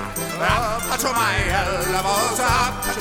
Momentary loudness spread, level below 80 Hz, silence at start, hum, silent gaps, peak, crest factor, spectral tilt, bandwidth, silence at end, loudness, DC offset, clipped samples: 4 LU; -32 dBFS; 0 s; none; none; -6 dBFS; 16 dB; -3 dB/octave; 18 kHz; 0 s; -20 LUFS; under 0.1%; under 0.1%